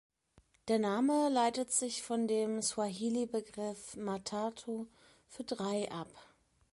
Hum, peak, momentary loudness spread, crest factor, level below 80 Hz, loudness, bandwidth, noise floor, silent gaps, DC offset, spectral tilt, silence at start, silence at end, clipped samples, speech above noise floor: none; -18 dBFS; 13 LU; 18 dB; -74 dBFS; -35 LUFS; 11.5 kHz; -69 dBFS; none; under 0.1%; -4 dB/octave; 0.65 s; 0.5 s; under 0.1%; 34 dB